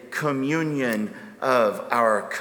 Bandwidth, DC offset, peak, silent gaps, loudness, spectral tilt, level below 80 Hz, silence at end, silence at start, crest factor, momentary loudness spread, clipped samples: over 20 kHz; under 0.1%; -4 dBFS; none; -23 LUFS; -5.5 dB/octave; -74 dBFS; 0 s; 0 s; 20 dB; 8 LU; under 0.1%